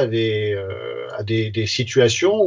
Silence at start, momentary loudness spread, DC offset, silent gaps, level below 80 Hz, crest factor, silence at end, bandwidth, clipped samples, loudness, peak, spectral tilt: 0 s; 12 LU; under 0.1%; none; -48 dBFS; 16 dB; 0 s; 7.6 kHz; under 0.1%; -20 LUFS; -4 dBFS; -5 dB/octave